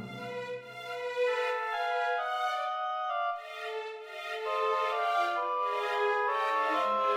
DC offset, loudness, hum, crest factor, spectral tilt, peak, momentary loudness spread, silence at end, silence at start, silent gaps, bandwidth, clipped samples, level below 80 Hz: under 0.1%; -32 LUFS; none; 14 dB; -3 dB/octave; -18 dBFS; 10 LU; 0 s; 0 s; none; 16 kHz; under 0.1%; -82 dBFS